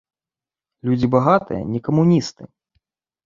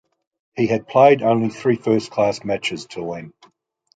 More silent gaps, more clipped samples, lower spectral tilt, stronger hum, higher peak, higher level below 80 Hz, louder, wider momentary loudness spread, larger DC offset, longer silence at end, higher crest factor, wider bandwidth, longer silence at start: neither; neither; first, -8 dB/octave vs -6 dB/octave; neither; about the same, 0 dBFS vs -2 dBFS; first, -52 dBFS vs -60 dBFS; about the same, -18 LUFS vs -19 LUFS; second, 10 LU vs 16 LU; neither; first, 0.8 s vs 0.65 s; about the same, 20 dB vs 18 dB; second, 7.6 kHz vs 9.2 kHz; first, 0.85 s vs 0.55 s